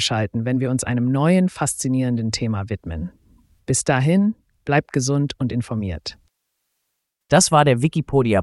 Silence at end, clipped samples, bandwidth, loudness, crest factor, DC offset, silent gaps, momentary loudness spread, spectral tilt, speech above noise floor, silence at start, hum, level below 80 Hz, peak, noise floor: 0 s; under 0.1%; 12 kHz; -20 LUFS; 20 dB; under 0.1%; none; 13 LU; -5 dB/octave; 57 dB; 0 s; none; -46 dBFS; -2 dBFS; -76 dBFS